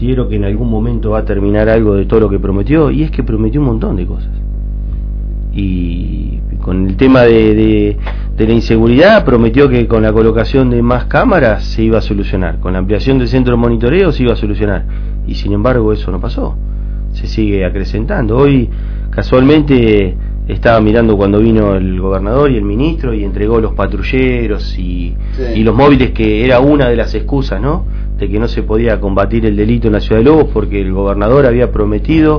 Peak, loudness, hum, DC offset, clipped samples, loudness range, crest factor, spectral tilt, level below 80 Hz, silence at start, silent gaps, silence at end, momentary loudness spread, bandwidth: 0 dBFS; -12 LUFS; 50 Hz at -15 dBFS; under 0.1%; 0.8%; 6 LU; 10 dB; -9 dB/octave; -16 dBFS; 0 s; none; 0 s; 12 LU; 5.4 kHz